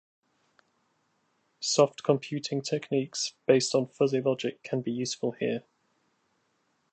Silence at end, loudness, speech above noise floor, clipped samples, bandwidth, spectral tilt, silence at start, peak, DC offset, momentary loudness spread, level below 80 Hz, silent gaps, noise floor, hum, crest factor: 1.3 s; -28 LUFS; 46 dB; under 0.1%; 9 kHz; -4.5 dB/octave; 1.6 s; -8 dBFS; under 0.1%; 8 LU; -78 dBFS; none; -73 dBFS; none; 22 dB